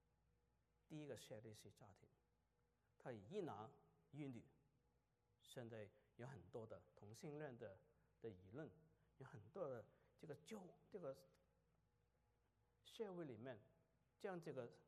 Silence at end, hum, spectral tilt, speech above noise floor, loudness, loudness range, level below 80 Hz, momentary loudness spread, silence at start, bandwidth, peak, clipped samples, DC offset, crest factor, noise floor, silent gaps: 0.05 s; none; -6 dB/octave; 29 dB; -58 LUFS; 2 LU; -88 dBFS; 11 LU; 0.9 s; 13 kHz; -38 dBFS; under 0.1%; under 0.1%; 20 dB; -86 dBFS; none